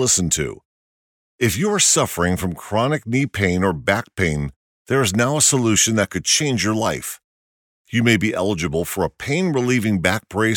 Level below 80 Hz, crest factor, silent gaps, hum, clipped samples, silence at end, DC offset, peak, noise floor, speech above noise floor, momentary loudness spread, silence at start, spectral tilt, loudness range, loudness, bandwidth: -44 dBFS; 18 dB; 0.65-1.39 s, 4.56-4.85 s, 7.24-7.85 s; none; under 0.1%; 0 s; under 0.1%; -2 dBFS; under -90 dBFS; over 71 dB; 9 LU; 0 s; -3.5 dB/octave; 3 LU; -19 LUFS; 18 kHz